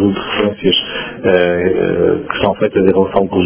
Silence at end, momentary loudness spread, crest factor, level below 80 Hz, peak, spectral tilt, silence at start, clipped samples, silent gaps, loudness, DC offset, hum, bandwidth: 0 s; 4 LU; 14 dB; -40 dBFS; 0 dBFS; -10 dB/octave; 0 s; under 0.1%; none; -14 LUFS; under 0.1%; none; 4 kHz